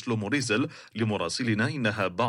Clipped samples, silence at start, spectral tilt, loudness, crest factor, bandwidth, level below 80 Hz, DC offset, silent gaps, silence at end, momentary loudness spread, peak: under 0.1%; 0 s; -5 dB/octave; -28 LUFS; 16 dB; 11.5 kHz; -66 dBFS; under 0.1%; none; 0 s; 4 LU; -12 dBFS